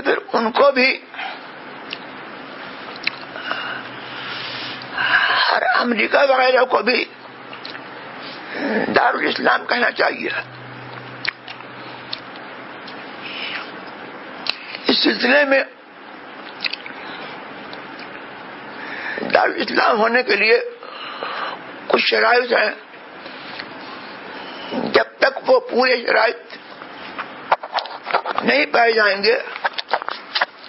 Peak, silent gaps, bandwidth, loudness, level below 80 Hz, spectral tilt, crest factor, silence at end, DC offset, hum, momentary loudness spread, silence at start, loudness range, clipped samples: 0 dBFS; none; 5.8 kHz; -18 LUFS; -68 dBFS; -6 dB/octave; 20 dB; 0 s; under 0.1%; none; 19 LU; 0 s; 11 LU; under 0.1%